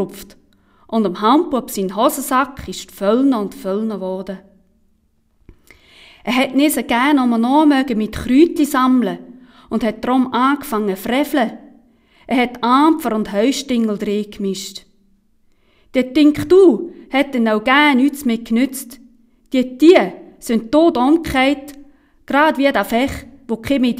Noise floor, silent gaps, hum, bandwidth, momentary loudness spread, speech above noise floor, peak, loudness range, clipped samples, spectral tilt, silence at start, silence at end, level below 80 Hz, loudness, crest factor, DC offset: -59 dBFS; none; none; 16 kHz; 13 LU; 44 dB; 0 dBFS; 6 LU; under 0.1%; -4.5 dB/octave; 0 s; 0 s; -46 dBFS; -16 LUFS; 16 dB; under 0.1%